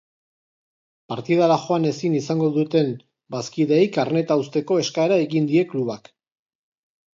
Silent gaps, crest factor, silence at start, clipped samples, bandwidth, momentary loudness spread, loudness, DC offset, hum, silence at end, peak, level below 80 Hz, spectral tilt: none; 18 dB; 1.1 s; under 0.1%; 7.6 kHz; 12 LU; -21 LUFS; under 0.1%; none; 1.25 s; -4 dBFS; -70 dBFS; -6.5 dB/octave